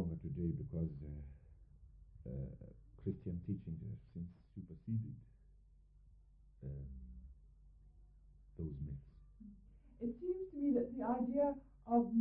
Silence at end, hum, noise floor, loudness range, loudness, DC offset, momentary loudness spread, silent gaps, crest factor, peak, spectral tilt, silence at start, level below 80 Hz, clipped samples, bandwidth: 0 s; none; -65 dBFS; 13 LU; -43 LUFS; under 0.1%; 23 LU; none; 20 dB; -24 dBFS; -12 dB/octave; 0 s; -58 dBFS; under 0.1%; 2.9 kHz